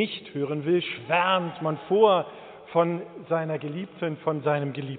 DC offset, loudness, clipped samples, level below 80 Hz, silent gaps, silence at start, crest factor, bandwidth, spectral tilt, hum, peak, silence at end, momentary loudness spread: under 0.1%; -26 LUFS; under 0.1%; -74 dBFS; none; 0 s; 20 dB; 4.6 kHz; -4 dB/octave; none; -6 dBFS; 0 s; 11 LU